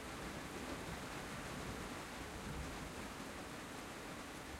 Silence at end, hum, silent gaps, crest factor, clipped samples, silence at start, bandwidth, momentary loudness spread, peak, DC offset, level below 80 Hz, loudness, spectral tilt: 0 s; none; none; 16 dB; under 0.1%; 0 s; 16 kHz; 2 LU; -32 dBFS; under 0.1%; -58 dBFS; -47 LUFS; -4 dB/octave